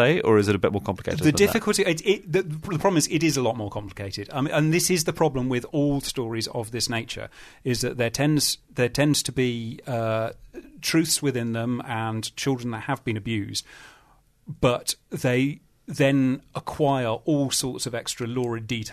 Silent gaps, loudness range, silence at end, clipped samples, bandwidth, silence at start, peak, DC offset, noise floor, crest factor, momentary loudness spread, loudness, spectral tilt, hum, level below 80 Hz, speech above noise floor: none; 4 LU; 0 s; under 0.1%; 13.5 kHz; 0 s; -6 dBFS; under 0.1%; -59 dBFS; 18 dB; 10 LU; -24 LUFS; -4.5 dB/octave; none; -50 dBFS; 34 dB